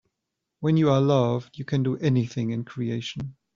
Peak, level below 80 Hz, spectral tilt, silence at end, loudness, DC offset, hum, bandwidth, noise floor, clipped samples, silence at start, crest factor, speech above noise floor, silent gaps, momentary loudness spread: -8 dBFS; -60 dBFS; -7.5 dB/octave; 0.25 s; -25 LUFS; under 0.1%; none; 7.4 kHz; -83 dBFS; under 0.1%; 0.6 s; 16 dB; 59 dB; none; 11 LU